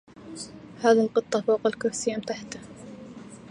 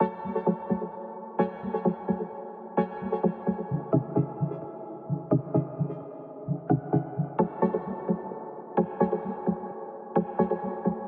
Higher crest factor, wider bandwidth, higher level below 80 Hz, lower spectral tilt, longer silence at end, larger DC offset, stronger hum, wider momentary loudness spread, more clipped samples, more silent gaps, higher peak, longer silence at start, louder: about the same, 20 dB vs 20 dB; first, 10.5 kHz vs 4.2 kHz; about the same, -64 dBFS vs -64 dBFS; second, -4 dB/octave vs -10 dB/octave; about the same, 0 s vs 0 s; neither; neither; first, 22 LU vs 12 LU; neither; neither; first, -6 dBFS vs -10 dBFS; first, 0.2 s vs 0 s; first, -25 LUFS vs -30 LUFS